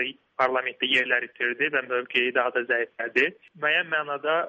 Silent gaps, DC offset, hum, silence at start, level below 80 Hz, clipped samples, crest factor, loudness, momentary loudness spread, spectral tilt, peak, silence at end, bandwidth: none; under 0.1%; none; 0 s; -74 dBFS; under 0.1%; 18 dB; -25 LUFS; 4 LU; -4 dB/octave; -8 dBFS; 0 s; 8.4 kHz